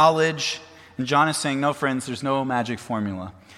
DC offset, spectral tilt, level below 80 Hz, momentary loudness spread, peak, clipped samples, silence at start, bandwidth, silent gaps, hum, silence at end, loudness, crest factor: under 0.1%; -4.5 dB/octave; -64 dBFS; 11 LU; -4 dBFS; under 0.1%; 0 s; 14.5 kHz; none; none; 0.05 s; -24 LUFS; 20 dB